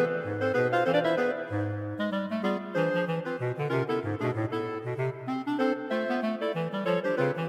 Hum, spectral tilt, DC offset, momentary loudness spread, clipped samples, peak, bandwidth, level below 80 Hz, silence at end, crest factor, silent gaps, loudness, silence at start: none; -7.5 dB/octave; under 0.1%; 7 LU; under 0.1%; -12 dBFS; 13.5 kHz; -72 dBFS; 0 s; 16 dB; none; -29 LUFS; 0 s